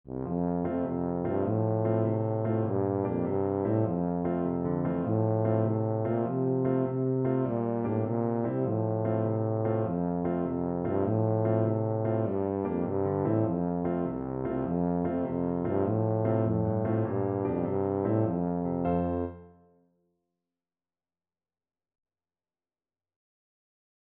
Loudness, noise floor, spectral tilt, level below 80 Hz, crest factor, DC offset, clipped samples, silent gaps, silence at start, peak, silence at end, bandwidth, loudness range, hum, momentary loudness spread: -29 LUFS; under -90 dBFS; -11 dB/octave; -58 dBFS; 16 dB; under 0.1%; under 0.1%; none; 0.05 s; -14 dBFS; 4.65 s; 3.4 kHz; 2 LU; none; 3 LU